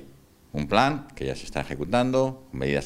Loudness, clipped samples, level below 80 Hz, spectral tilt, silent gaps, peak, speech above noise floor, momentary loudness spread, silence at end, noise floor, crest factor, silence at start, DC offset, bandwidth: -26 LUFS; under 0.1%; -46 dBFS; -6 dB/octave; none; -2 dBFS; 27 dB; 11 LU; 0 s; -52 dBFS; 24 dB; 0 s; under 0.1%; 15.5 kHz